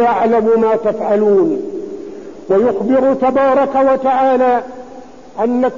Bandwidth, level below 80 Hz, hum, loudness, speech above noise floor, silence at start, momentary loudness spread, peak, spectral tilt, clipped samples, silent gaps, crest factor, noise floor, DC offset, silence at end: 7.4 kHz; -52 dBFS; none; -13 LUFS; 23 dB; 0 s; 17 LU; -4 dBFS; -7.5 dB/octave; under 0.1%; none; 10 dB; -36 dBFS; 0.9%; 0 s